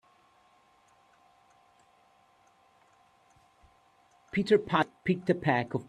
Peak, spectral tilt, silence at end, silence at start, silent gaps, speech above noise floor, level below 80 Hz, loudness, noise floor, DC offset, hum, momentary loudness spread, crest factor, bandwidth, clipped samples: -10 dBFS; -7 dB/octave; 0.05 s; 4.35 s; none; 37 dB; -68 dBFS; -28 LUFS; -65 dBFS; under 0.1%; none; 7 LU; 24 dB; 10.5 kHz; under 0.1%